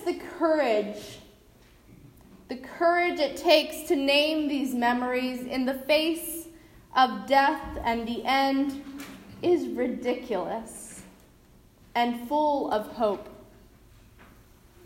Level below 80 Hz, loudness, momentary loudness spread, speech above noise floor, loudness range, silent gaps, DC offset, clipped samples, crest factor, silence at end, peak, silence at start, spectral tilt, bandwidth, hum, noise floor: -56 dBFS; -26 LUFS; 18 LU; 30 dB; 6 LU; none; under 0.1%; under 0.1%; 20 dB; 0.6 s; -8 dBFS; 0 s; -3.5 dB/octave; 16 kHz; none; -56 dBFS